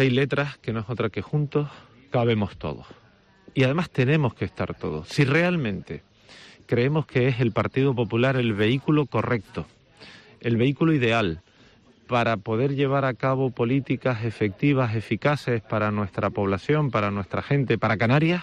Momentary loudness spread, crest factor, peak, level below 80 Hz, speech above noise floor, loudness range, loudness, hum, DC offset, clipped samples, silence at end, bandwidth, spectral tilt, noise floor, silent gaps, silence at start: 9 LU; 16 dB; -8 dBFS; -54 dBFS; 32 dB; 2 LU; -24 LUFS; none; under 0.1%; under 0.1%; 0 s; 9.8 kHz; -7.5 dB/octave; -55 dBFS; none; 0 s